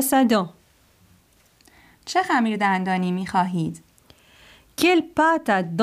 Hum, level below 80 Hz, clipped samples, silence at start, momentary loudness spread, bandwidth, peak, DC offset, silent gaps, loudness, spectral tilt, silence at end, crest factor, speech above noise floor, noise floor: none; -60 dBFS; under 0.1%; 0 s; 13 LU; 15.5 kHz; -6 dBFS; under 0.1%; none; -21 LUFS; -5 dB/octave; 0 s; 18 dB; 38 dB; -58 dBFS